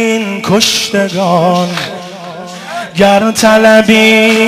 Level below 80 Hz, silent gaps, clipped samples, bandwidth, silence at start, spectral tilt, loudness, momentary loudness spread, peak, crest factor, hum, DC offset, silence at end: -46 dBFS; none; 0.4%; 16 kHz; 0 s; -4 dB/octave; -9 LUFS; 19 LU; 0 dBFS; 10 dB; none; under 0.1%; 0 s